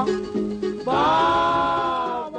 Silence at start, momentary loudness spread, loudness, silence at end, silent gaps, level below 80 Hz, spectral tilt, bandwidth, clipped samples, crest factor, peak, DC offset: 0 s; 9 LU; -21 LUFS; 0 s; none; -48 dBFS; -5.5 dB/octave; 9.4 kHz; under 0.1%; 12 dB; -10 dBFS; under 0.1%